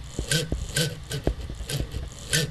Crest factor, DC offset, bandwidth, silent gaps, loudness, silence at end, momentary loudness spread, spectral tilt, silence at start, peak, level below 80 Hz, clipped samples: 24 dB; under 0.1%; 13 kHz; none; -28 LUFS; 0 s; 8 LU; -3.5 dB/octave; 0 s; -6 dBFS; -36 dBFS; under 0.1%